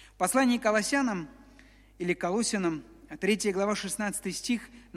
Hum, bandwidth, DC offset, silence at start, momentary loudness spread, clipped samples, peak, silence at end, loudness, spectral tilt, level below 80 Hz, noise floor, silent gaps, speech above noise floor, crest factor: none; 15.5 kHz; under 0.1%; 0 s; 11 LU; under 0.1%; -12 dBFS; 0.15 s; -29 LUFS; -3.5 dB/octave; -60 dBFS; -56 dBFS; none; 27 dB; 18 dB